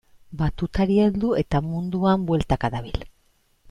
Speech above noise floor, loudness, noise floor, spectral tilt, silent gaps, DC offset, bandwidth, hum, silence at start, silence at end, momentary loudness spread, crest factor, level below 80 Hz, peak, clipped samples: 41 dB; -23 LUFS; -63 dBFS; -8.5 dB/octave; none; under 0.1%; 10.5 kHz; none; 0.3 s; 0.6 s; 12 LU; 16 dB; -38 dBFS; -8 dBFS; under 0.1%